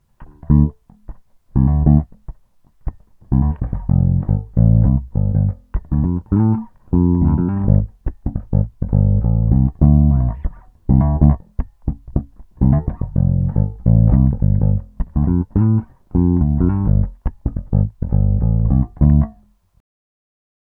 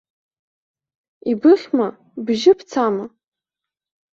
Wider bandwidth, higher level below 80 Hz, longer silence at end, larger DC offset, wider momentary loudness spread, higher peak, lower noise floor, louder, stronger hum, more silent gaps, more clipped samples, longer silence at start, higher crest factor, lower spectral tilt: second, 2.2 kHz vs 7.6 kHz; first, -22 dBFS vs -66 dBFS; first, 1.5 s vs 1.05 s; neither; second, 12 LU vs 15 LU; about the same, 0 dBFS vs -2 dBFS; second, -51 dBFS vs -87 dBFS; about the same, -17 LUFS vs -18 LUFS; neither; neither; neither; second, 0.2 s vs 1.25 s; about the same, 16 dB vs 18 dB; first, -14.5 dB/octave vs -5.5 dB/octave